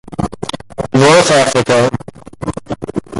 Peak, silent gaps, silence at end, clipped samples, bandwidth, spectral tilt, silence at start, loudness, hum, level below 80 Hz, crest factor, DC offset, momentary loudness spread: 0 dBFS; none; 0 s; under 0.1%; 11.5 kHz; -4.5 dB/octave; 0.1 s; -12 LUFS; none; -38 dBFS; 14 dB; under 0.1%; 16 LU